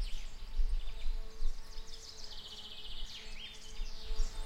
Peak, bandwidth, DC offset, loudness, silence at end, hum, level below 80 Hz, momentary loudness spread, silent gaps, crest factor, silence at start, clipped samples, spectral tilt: -20 dBFS; 9.2 kHz; under 0.1%; -46 LUFS; 0 s; none; -38 dBFS; 7 LU; none; 14 dB; 0 s; under 0.1%; -3 dB/octave